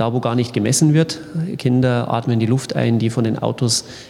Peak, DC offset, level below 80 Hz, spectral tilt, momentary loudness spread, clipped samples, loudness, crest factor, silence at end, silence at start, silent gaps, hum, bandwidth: -2 dBFS; under 0.1%; -56 dBFS; -5.5 dB/octave; 6 LU; under 0.1%; -18 LUFS; 16 dB; 0 s; 0 s; none; none; 15 kHz